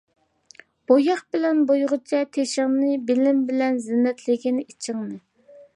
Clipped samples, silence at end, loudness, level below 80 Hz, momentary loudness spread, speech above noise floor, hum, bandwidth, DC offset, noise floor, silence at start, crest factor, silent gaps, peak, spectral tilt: under 0.1%; 0.15 s; -22 LUFS; -78 dBFS; 11 LU; 30 dB; none; 11 kHz; under 0.1%; -52 dBFS; 0.9 s; 18 dB; none; -4 dBFS; -4.5 dB/octave